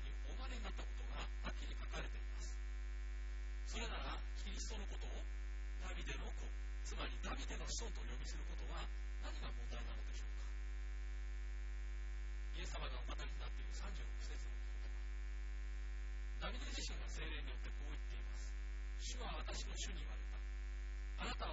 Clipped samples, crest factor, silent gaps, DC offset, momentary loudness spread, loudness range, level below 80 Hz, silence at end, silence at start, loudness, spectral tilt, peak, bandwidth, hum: under 0.1%; 14 dB; none; under 0.1%; 3 LU; 1 LU; -46 dBFS; 0 s; 0 s; -48 LUFS; -3.5 dB/octave; -32 dBFS; 7.6 kHz; 50 Hz at -45 dBFS